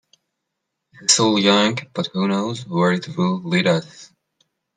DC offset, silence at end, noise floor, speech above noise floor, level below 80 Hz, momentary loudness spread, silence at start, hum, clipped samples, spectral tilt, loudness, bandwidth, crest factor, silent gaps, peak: under 0.1%; 0.7 s; -79 dBFS; 60 dB; -64 dBFS; 9 LU; 1 s; none; under 0.1%; -4 dB/octave; -19 LUFS; 9.6 kHz; 20 dB; none; -2 dBFS